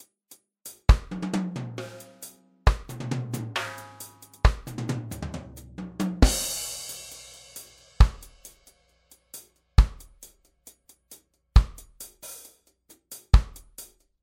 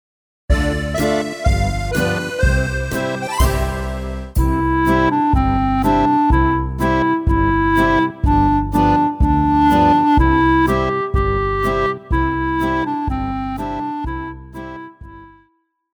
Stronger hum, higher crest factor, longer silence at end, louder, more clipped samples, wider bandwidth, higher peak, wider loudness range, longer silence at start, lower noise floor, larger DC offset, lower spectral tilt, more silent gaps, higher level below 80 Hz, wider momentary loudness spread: neither; first, 22 dB vs 14 dB; second, 0.4 s vs 0.7 s; second, -27 LUFS vs -17 LUFS; neither; second, 16.5 kHz vs over 20 kHz; about the same, -4 dBFS vs -2 dBFS; about the same, 4 LU vs 6 LU; first, 0.65 s vs 0.5 s; about the same, -61 dBFS vs -62 dBFS; neither; second, -5 dB/octave vs -6.5 dB/octave; neither; about the same, -28 dBFS vs -24 dBFS; first, 21 LU vs 10 LU